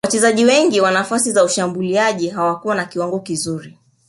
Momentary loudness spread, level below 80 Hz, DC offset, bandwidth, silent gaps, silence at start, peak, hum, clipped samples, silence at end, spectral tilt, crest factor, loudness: 10 LU; -60 dBFS; under 0.1%; 12 kHz; none; 0.05 s; -2 dBFS; none; under 0.1%; 0.4 s; -3.5 dB/octave; 14 dB; -16 LUFS